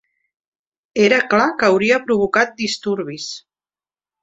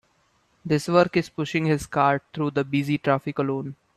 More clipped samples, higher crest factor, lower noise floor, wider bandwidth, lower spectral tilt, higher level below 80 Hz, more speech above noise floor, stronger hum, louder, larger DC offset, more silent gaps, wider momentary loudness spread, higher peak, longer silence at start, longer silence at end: neither; about the same, 18 dB vs 20 dB; first, under -90 dBFS vs -65 dBFS; second, 8 kHz vs 13 kHz; second, -4 dB/octave vs -6.5 dB/octave; about the same, -58 dBFS vs -58 dBFS; first, over 73 dB vs 42 dB; neither; first, -17 LUFS vs -24 LUFS; neither; neither; first, 13 LU vs 7 LU; about the same, -2 dBFS vs -4 dBFS; first, 0.95 s vs 0.65 s; first, 0.85 s vs 0.25 s